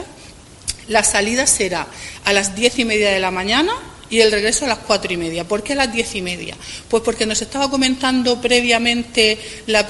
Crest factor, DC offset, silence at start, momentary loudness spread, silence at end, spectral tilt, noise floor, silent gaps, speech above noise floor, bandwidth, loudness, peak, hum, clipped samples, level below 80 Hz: 18 dB; under 0.1%; 0 s; 11 LU; 0 s; -2 dB/octave; -40 dBFS; none; 23 dB; 12 kHz; -17 LUFS; 0 dBFS; none; under 0.1%; -42 dBFS